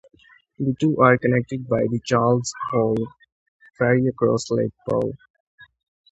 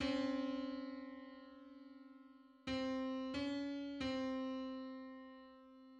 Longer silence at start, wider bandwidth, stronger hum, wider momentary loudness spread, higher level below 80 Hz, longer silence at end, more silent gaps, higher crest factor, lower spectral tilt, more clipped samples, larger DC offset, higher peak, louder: first, 0.6 s vs 0 s; about the same, 8.2 kHz vs 8.6 kHz; neither; second, 10 LU vs 19 LU; first, -56 dBFS vs -70 dBFS; first, 0.45 s vs 0 s; first, 3.32-3.59 s, 5.30-5.34 s, 5.40-5.58 s vs none; first, 22 dB vs 16 dB; first, -6.5 dB/octave vs -5 dB/octave; neither; neither; first, 0 dBFS vs -28 dBFS; first, -21 LUFS vs -44 LUFS